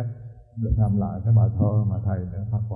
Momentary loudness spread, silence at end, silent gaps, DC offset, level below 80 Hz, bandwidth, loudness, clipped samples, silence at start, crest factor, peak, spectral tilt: 13 LU; 0 s; none; under 0.1%; -36 dBFS; 1.7 kHz; -23 LUFS; under 0.1%; 0 s; 14 dB; -8 dBFS; -14 dB/octave